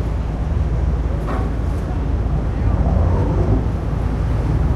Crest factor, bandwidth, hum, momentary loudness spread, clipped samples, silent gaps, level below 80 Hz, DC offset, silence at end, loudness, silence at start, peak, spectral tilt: 12 dB; 6.8 kHz; none; 5 LU; under 0.1%; none; -20 dBFS; under 0.1%; 0 s; -20 LUFS; 0 s; -4 dBFS; -9 dB/octave